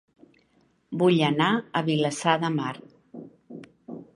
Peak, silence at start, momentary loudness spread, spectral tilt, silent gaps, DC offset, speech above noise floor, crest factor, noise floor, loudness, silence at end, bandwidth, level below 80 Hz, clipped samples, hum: -6 dBFS; 0.9 s; 24 LU; -5.5 dB/octave; none; under 0.1%; 42 dB; 22 dB; -65 dBFS; -24 LUFS; 0.1 s; 11.5 kHz; -70 dBFS; under 0.1%; none